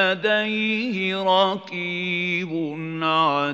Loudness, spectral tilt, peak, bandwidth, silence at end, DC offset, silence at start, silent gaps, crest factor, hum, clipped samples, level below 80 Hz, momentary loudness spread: -22 LUFS; -6 dB/octave; -6 dBFS; 8 kHz; 0 s; under 0.1%; 0 s; none; 18 dB; none; under 0.1%; -76 dBFS; 8 LU